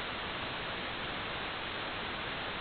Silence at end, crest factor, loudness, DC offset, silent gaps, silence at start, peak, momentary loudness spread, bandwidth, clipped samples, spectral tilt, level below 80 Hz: 0 s; 14 dB; -37 LUFS; under 0.1%; none; 0 s; -24 dBFS; 0 LU; 4.9 kHz; under 0.1%; -1 dB/octave; -56 dBFS